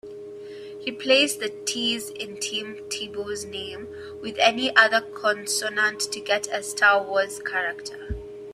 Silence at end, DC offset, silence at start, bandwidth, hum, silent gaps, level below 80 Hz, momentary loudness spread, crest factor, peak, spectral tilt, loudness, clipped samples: 0 s; under 0.1%; 0.05 s; 15.5 kHz; none; none; -52 dBFS; 17 LU; 24 dB; -2 dBFS; -1.5 dB/octave; -23 LUFS; under 0.1%